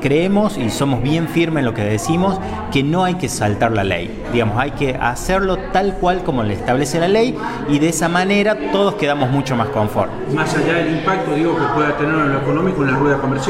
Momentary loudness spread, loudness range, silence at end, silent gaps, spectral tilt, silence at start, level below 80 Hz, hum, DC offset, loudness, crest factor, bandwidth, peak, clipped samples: 4 LU; 2 LU; 0 s; none; -5.5 dB/octave; 0 s; -34 dBFS; none; under 0.1%; -17 LUFS; 12 dB; 16 kHz; -4 dBFS; under 0.1%